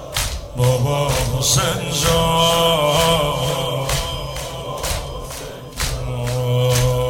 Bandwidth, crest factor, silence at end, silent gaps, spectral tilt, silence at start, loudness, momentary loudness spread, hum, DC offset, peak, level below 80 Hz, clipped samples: 17.5 kHz; 16 dB; 0 s; none; -4 dB/octave; 0 s; -18 LUFS; 12 LU; none; 0.1%; -2 dBFS; -32 dBFS; under 0.1%